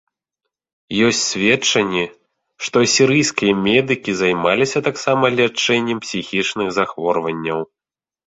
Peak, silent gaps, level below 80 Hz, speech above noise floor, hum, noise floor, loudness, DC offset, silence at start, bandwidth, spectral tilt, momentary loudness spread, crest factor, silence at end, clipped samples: -2 dBFS; none; -56 dBFS; over 73 dB; none; under -90 dBFS; -17 LUFS; under 0.1%; 0.9 s; 8.2 kHz; -3.5 dB/octave; 9 LU; 18 dB; 0.65 s; under 0.1%